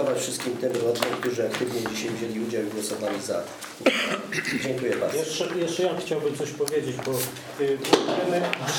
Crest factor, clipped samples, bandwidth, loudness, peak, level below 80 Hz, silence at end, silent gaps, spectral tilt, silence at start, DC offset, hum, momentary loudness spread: 24 dB; under 0.1%; over 20 kHz; -26 LUFS; -2 dBFS; -68 dBFS; 0 s; none; -3.5 dB/octave; 0 s; under 0.1%; none; 7 LU